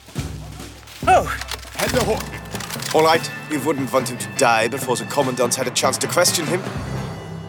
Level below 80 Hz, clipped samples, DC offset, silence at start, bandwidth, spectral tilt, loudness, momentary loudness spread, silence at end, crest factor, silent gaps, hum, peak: -40 dBFS; under 0.1%; under 0.1%; 0.05 s; 19.5 kHz; -3.5 dB/octave; -20 LUFS; 13 LU; 0 s; 18 dB; none; none; -4 dBFS